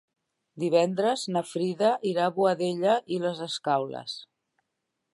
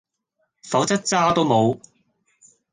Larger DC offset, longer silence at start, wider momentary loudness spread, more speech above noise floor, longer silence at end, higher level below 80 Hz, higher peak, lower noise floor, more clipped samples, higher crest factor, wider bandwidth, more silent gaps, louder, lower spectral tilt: neither; about the same, 0.55 s vs 0.65 s; first, 9 LU vs 6 LU; about the same, 55 dB vs 54 dB; about the same, 0.9 s vs 0.95 s; second, -80 dBFS vs -60 dBFS; second, -10 dBFS vs -4 dBFS; first, -82 dBFS vs -73 dBFS; neither; about the same, 18 dB vs 18 dB; about the same, 11.5 kHz vs 10.5 kHz; neither; second, -27 LUFS vs -20 LUFS; about the same, -5 dB/octave vs -4.5 dB/octave